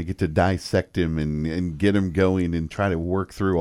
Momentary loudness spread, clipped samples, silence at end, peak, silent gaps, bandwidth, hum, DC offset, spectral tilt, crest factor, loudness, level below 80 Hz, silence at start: 5 LU; under 0.1%; 0 s; -6 dBFS; none; 12 kHz; none; under 0.1%; -7.5 dB/octave; 16 dB; -23 LUFS; -40 dBFS; 0 s